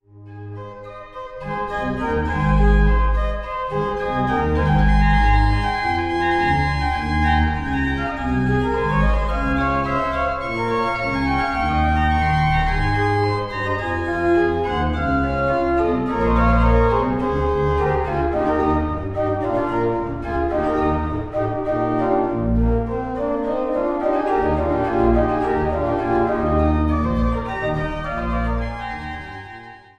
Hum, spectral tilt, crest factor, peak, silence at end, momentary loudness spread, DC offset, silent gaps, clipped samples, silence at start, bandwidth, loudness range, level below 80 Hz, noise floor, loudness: none; -8 dB/octave; 16 dB; -4 dBFS; 0.2 s; 8 LU; under 0.1%; none; under 0.1%; 0.15 s; 8.8 kHz; 3 LU; -26 dBFS; -39 dBFS; -20 LUFS